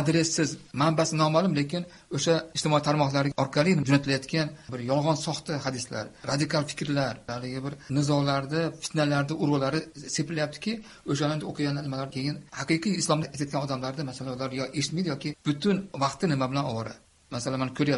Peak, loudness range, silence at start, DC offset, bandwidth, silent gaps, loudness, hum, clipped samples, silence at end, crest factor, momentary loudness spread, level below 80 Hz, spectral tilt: -6 dBFS; 4 LU; 0 s; under 0.1%; 11.5 kHz; none; -28 LUFS; none; under 0.1%; 0 s; 22 dB; 10 LU; -60 dBFS; -5 dB/octave